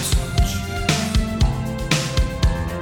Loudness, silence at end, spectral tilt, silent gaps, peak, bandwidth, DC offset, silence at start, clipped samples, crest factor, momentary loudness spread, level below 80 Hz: -21 LUFS; 0 s; -4.5 dB/octave; none; -2 dBFS; 18.5 kHz; under 0.1%; 0 s; under 0.1%; 18 dB; 3 LU; -24 dBFS